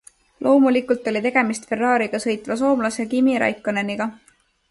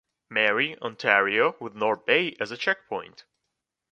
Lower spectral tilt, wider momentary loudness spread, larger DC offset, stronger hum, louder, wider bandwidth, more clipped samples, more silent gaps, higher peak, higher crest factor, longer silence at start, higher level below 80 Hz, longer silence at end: about the same, -5 dB/octave vs -4.5 dB/octave; about the same, 8 LU vs 9 LU; neither; neither; first, -20 LUFS vs -24 LUFS; first, 11.5 kHz vs 8.6 kHz; neither; neither; about the same, -4 dBFS vs -2 dBFS; second, 16 dB vs 24 dB; about the same, 0.4 s vs 0.3 s; first, -62 dBFS vs -74 dBFS; second, 0.55 s vs 0.85 s